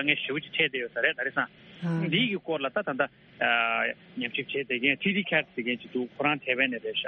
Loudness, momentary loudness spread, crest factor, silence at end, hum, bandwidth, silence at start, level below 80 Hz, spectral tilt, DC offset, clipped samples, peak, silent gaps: -28 LUFS; 7 LU; 20 dB; 0 s; none; 6 kHz; 0 s; -70 dBFS; -2 dB/octave; under 0.1%; under 0.1%; -8 dBFS; none